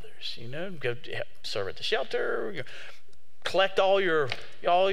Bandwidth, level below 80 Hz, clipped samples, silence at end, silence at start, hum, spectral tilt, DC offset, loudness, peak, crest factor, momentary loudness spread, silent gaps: 15 kHz; -66 dBFS; under 0.1%; 0 s; 0.05 s; none; -4.5 dB/octave; 3%; -29 LUFS; -10 dBFS; 20 dB; 14 LU; none